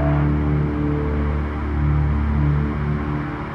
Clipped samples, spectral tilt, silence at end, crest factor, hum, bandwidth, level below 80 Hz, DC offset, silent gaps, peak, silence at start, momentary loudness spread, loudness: under 0.1%; -10 dB/octave; 0 s; 12 dB; none; 5 kHz; -24 dBFS; under 0.1%; none; -8 dBFS; 0 s; 5 LU; -21 LUFS